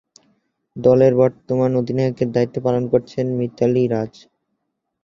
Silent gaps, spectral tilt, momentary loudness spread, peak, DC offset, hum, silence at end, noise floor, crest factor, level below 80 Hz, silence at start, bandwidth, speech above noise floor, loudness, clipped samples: none; -9 dB/octave; 9 LU; -2 dBFS; under 0.1%; none; 0.95 s; -75 dBFS; 18 dB; -56 dBFS; 0.75 s; 7.4 kHz; 57 dB; -18 LUFS; under 0.1%